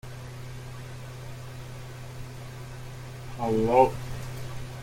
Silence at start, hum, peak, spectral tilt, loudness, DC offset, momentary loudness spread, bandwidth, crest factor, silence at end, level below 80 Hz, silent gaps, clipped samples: 0.05 s; none; -6 dBFS; -6.5 dB/octave; -28 LUFS; under 0.1%; 19 LU; 16.5 kHz; 24 dB; 0 s; -46 dBFS; none; under 0.1%